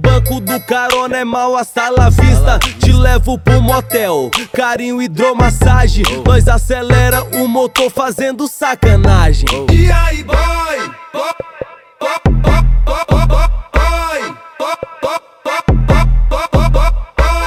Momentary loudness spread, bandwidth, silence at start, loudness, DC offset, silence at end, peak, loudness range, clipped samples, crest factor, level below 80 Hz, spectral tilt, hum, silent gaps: 10 LU; 15.5 kHz; 0 s; -13 LUFS; under 0.1%; 0 s; 0 dBFS; 4 LU; 0.3%; 10 dB; -14 dBFS; -5.5 dB/octave; none; none